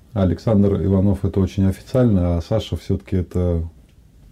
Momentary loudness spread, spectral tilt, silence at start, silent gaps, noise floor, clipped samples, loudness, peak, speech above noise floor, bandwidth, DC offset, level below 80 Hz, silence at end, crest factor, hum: 7 LU; -9 dB/octave; 0.15 s; none; -48 dBFS; under 0.1%; -20 LUFS; -4 dBFS; 30 dB; 11.5 kHz; under 0.1%; -36 dBFS; 0.6 s; 14 dB; none